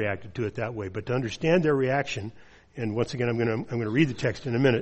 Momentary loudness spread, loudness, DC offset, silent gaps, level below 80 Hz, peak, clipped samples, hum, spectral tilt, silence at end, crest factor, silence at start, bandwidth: 10 LU; -27 LUFS; under 0.1%; none; -56 dBFS; -8 dBFS; under 0.1%; none; -7 dB/octave; 0 s; 18 dB; 0 s; 8.4 kHz